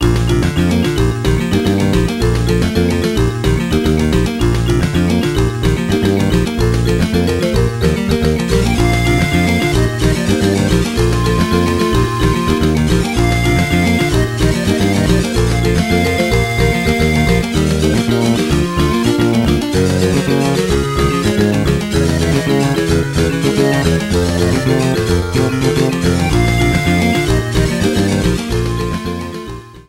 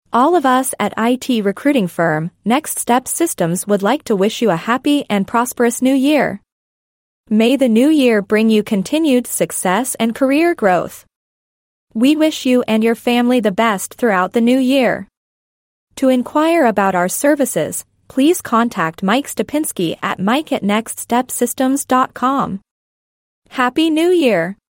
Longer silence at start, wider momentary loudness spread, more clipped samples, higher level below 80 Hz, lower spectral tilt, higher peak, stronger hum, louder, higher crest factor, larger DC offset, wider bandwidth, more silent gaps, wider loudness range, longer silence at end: second, 0 s vs 0.15 s; second, 2 LU vs 6 LU; neither; first, -22 dBFS vs -58 dBFS; first, -6 dB/octave vs -4.5 dB/octave; about the same, 0 dBFS vs -2 dBFS; neither; about the same, -14 LUFS vs -15 LUFS; about the same, 12 dB vs 14 dB; neither; about the same, 16 kHz vs 16.5 kHz; second, none vs 6.52-7.24 s, 11.16-11.87 s, 15.17-15.87 s, 22.71-23.42 s; about the same, 1 LU vs 3 LU; about the same, 0.1 s vs 0.2 s